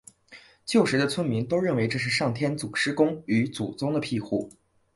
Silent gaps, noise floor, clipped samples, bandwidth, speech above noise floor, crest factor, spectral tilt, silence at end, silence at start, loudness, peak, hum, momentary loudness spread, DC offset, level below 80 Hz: none; -52 dBFS; under 0.1%; 11.5 kHz; 27 dB; 18 dB; -5.5 dB/octave; 0.45 s; 0.3 s; -26 LUFS; -8 dBFS; none; 7 LU; under 0.1%; -62 dBFS